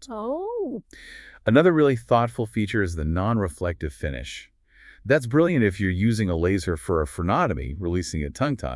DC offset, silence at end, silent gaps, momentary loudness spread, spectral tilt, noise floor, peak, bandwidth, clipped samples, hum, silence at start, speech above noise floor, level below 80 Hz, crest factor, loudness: under 0.1%; 0 s; none; 13 LU; -7 dB/octave; -52 dBFS; -4 dBFS; 12 kHz; under 0.1%; none; 0 s; 29 dB; -42 dBFS; 20 dB; -24 LUFS